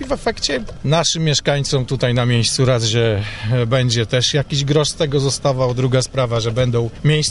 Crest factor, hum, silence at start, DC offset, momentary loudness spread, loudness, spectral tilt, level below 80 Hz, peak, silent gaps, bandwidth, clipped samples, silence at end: 14 dB; none; 0 s; under 0.1%; 4 LU; -17 LUFS; -4.5 dB/octave; -38 dBFS; -2 dBFS; none; 11.5 kHz; under 0.1%; 0 s